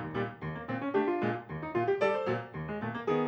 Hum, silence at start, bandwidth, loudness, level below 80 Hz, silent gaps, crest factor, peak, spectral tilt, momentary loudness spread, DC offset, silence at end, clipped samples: none; 0 s; 8.2 kHz; -33 LUFS; -62 dBFS; none; 16 dB; -16 dBFS; -8 dB/octave; 8 LU; under 0.1%; 0 s; under 0.1%